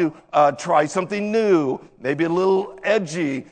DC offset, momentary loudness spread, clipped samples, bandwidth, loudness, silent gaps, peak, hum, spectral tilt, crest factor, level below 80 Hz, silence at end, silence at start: under 0.1%; 7 LU; under 0.1%; 9.4 kHz; -20 LUFS; none; -4 dBFS; none; -5.5 dB/octave; 16 dB; -64 dBFS; 0.1 s; 0 s